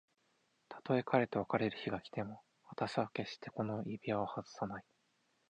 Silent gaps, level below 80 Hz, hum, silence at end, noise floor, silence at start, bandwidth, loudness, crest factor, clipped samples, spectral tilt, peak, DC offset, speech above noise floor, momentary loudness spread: none; -74 dBFS; none; 0.7 s; -78 dBFS; 0.7 s; 9.6 kHz; -39 LUFS; 24 dB; under 0.1%; -7 dB/octave; -16 dBFS; under 0.1%; 40 dB; 16 LU